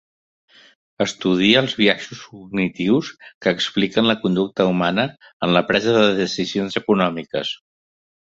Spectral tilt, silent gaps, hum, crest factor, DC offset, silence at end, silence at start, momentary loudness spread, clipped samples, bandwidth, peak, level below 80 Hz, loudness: -5 dB/octave; 3.35-3.41 s, 5.33-5.40 s; none; 20 dB; under 0.1%; 0.85 s; 1 s; 10 LU; under 0.1%; 7.8 kHz; 0 dBFS; -56 dBFS; -19 LUFS